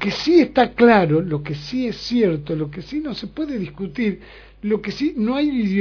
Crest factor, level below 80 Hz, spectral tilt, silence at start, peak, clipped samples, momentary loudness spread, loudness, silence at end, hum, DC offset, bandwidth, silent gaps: 18 dB; -46 dBFS; -7 dB/octave; 0 s; -2 dBFS; under 0.1%; 13 LU; -20 LUFS; 0 s; none; under 0.1%; 5.4 kHz; none